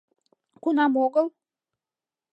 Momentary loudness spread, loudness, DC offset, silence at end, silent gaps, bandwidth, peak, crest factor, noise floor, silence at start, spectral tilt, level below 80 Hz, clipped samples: 10 LU; -24 LUFS; under 0.1%; 1.05 s; none; 5.6 kHz; -10 dBFS; 18 dB; under -90 dBFS; 0.65 s; -6 dB/octave; -88 dBFS; under 0.1%